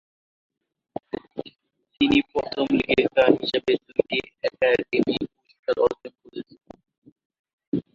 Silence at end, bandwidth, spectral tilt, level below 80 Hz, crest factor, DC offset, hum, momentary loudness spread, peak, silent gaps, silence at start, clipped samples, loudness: 0.15 s; 7.4 kHz; -6 dB/octave; -56 dBFS; 22 dB; under 0.1%; none; 19 LU; -2 dBFS; 5.59-5.63 s, 6.98-7.02 s, 7.12-7.16 s, 7.25-7.30 s, 7.39-7.44 s, 7.53-7.58 s, 7.67-7.72 s; 1.35 s; under 0.1%; -23 LUFS